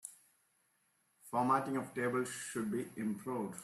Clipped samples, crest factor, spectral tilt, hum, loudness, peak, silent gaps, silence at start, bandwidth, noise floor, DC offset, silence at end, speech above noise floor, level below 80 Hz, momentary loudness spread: under 0.1%; 20 dB; -5 dB/octave; none; -37 LUFS; -18 dBFS; none; 0.05 s; 14.5 kHz; -77 dBFS; under 0.1%; 0 s; 40 dB; -80 dBFS; 8 LU